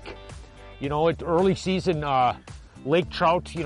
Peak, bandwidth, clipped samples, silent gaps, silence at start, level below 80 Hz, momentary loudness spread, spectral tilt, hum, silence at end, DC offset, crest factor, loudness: -10 dBFS; 11.5 kHz; under 0.1%; none; 0 s; -44 dBFS; 20 LU; -6.5 dB/octave; none; 0 s; under 0.1%; 14 dB; -24 LUFS